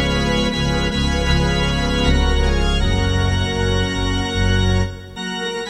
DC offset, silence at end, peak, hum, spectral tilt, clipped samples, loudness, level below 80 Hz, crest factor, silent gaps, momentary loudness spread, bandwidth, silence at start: under 0.1%; 0 s; -4 dBFS; none; -5 dB/octave; under 0.1%; -19 LUFS; -22 dBFS; 14 dB; none; 4 LU; 12.5 kHz; 0 s